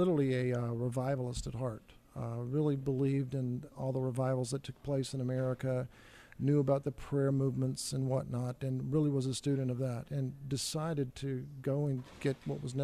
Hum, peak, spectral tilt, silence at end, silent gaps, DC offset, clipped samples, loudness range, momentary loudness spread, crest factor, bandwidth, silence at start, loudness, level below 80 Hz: none; -18 dBFS; -7 dB/octave; 0 s; none; under 0.1%; under 0.1%; 2 LU; 8 LU; 16 dB; 14 kHz; 0 s; -35 LUFS; -58 dBFS